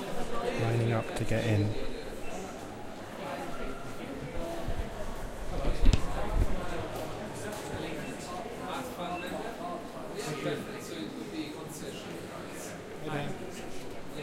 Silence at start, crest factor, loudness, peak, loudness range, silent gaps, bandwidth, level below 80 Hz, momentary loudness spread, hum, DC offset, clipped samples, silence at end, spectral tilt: 0 s; 22 dB; -36 LUFS; -10 dBFS; 6 LU; none; 16 kHz; -38 dBFS; 11 LU; none; under 0.1%; under 0.1%; 0 s; -5.5 dB/octave